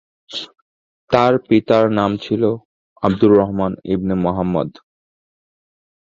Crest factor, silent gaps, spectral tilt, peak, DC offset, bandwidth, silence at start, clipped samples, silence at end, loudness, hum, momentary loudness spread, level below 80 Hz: 18 dB; 0.62-1.08 s, 2.65-2.96 s; -8 dB/octave; 0 dBFS; under 0.1%; 7.4 kHz; 0.3 s; under 0.1%; 1.4 s; -17 LUFS; none; 16 LU; -46 dBFS